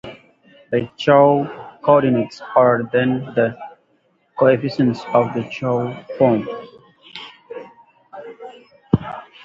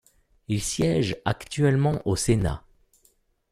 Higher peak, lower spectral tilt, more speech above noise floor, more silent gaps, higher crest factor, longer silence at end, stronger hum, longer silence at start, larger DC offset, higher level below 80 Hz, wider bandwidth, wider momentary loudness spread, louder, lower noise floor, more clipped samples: first, 0 dBFS vs -8 dBFS; first, -8 dB/octave vs -5.5 dB/octave; first, 45 dB vs 41 dB; neither; about the same, 20 dB vs 16 dB; second, 0.2 s vs 0.9 s; neither; second, 0.05 s vs 0.5 s; neither; second, -52 dBFS vs -44 dBFS; second, 7.6 kHz vs 14.5 kHz; first, 22 LU vs 8 LU; first, -18 LUFS vs -25 LUFS; about the same, -62 dBFS vs -65 dBFS; neither